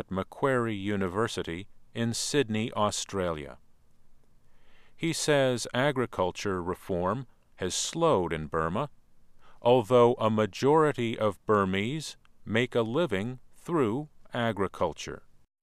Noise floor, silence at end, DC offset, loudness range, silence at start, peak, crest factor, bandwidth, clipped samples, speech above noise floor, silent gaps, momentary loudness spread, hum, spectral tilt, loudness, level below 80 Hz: -53 dBFS; 0.45 s; under 0.1%; 5 LU; 0 s; -10 dBFS; 20 dB; 15 kHz; under 0.1%; 25 dB; none; 13 LU; none; -5 dB/octave; -28 LUFS; -56 dBFS